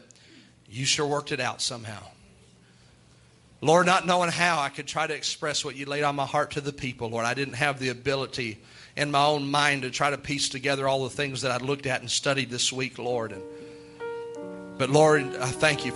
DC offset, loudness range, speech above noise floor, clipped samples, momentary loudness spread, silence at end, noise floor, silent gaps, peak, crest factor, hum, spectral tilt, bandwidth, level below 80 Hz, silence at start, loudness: under 0.1%; 4 LU; 30 dB; under 0.1%; 16 LU; 0 s; -56 dBFS; none; -4 dBFS; 22 dB; none; -3.5 dB/octave; 12 kHz; -62 dBFS; 0.7 s; -26 LUFS